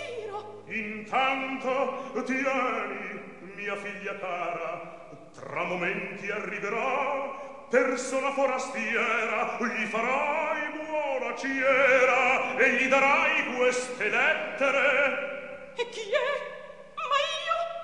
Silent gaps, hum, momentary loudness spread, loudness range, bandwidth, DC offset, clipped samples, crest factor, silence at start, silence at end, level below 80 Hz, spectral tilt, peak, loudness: none; none; 15 LU; 9 LU; 11 kHz; 0.2%; under 0.1%; 20 dB; 0 s; 0 s; -70 dBFS; -3 dB/octave; -8 dBFS; -27 LUFS